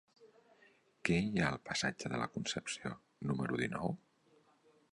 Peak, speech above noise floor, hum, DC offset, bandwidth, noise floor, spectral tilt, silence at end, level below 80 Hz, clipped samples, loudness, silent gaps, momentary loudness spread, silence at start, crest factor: -14 dBFS; 33 dB; none; under 0.1%; 11.5 kHz; -70 dBFS; -4.5 dB/octave; 0.95 s; -64 dBFS; under 0.1%; -38 LUFS; none; 9 LU; 0.2 s; 24 dB